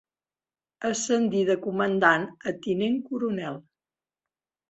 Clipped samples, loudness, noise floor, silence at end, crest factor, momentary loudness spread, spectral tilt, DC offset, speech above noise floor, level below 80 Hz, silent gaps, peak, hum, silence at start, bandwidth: under 0.1%; -26 LUFS; under -90 dBFS; 1.1 s; 22 dB; 11 LU; -4.5 dB/octave; under 0.1%; over 65 dB; -70 dBFS; none; -6 dBFS; none; 0.8 s; 8.2 kHz